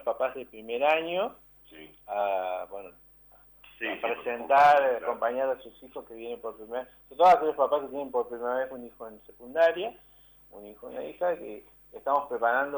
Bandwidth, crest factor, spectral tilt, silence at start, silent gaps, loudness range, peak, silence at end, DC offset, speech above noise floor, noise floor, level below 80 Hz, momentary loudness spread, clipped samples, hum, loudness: over 20 kHz; 16 dB; -4.5 dB/octave; 0 s; none; 6 LU; -12 dBFS; 0 s; under 0.1%; 29 dB; -57 dBFS; -66 dBFS; 23 LU; under 0.1%; 50 Hz at -65 dBFS; -27 LUFS